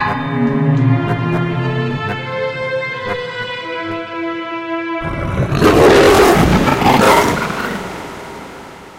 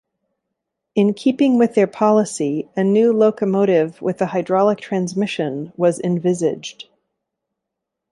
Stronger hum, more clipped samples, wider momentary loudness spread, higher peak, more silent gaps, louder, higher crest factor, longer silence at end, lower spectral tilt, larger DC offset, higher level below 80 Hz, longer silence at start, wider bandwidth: neither; neither; first, 15 LU vs 7 LU; about the same, 0 dBFS vs -2 dBFS; neither; first, -14 LUFS vs -18 LUFS; about the same, 14 dB vs 16 dB; second, 0 s vs 1.3 s; about the same, -5.5 dB/octave vs -6.5 dB/octave; neither; first, -32 dBFS vs -66 dBFS; second, 0 s vs 0.95 s; first, 16.5 kHz vs 11.5 kHz